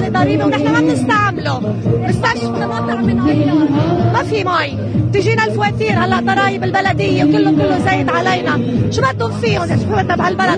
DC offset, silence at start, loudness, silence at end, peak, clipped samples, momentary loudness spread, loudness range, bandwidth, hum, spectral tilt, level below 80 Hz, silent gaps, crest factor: under 0.1%; 0 s; -14 LUFS; 0 s; 0 dBFS; under 0.1%; 4 LU; 1 LU; 10 kHz; none; -6.5 dB/octave; -38 dBFS; none; 14 dB